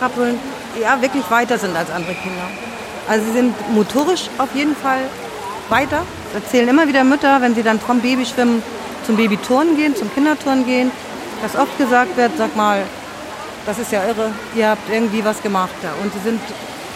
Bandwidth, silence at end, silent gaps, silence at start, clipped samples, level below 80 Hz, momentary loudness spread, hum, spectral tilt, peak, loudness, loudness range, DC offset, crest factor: 16 kHz; 0 s; none; 0 s; under 0.1%; -52 dBFS; 13 LU; none; -4.5 dB/octave; -2 dBFS; -17 LUFS; 4 LU; under 0.1%; 16 dB